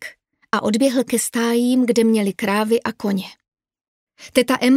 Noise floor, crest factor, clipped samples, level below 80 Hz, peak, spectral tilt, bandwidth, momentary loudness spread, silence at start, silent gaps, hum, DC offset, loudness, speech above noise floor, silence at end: -40 dBFS; 18 dB; under 0.1%; -62 dBFS; 0 dBFS; -4.5 dB/octave; 16 kHz; 8 LU; 0 s; 3.48-3.52 s, 3.88-4.07 s; none; under 0.1%; -19 LUFS; 23 dB; 0 s